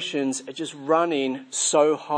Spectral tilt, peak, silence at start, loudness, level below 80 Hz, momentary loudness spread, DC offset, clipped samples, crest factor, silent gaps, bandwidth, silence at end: -2.5 dB/octave; -6 dBFS; 0 s; -23 LUFS; -82 dBFS; 11 LU; under 0.1%; under 0.1%; 18 dB; none; 10.5 kHz; 0 s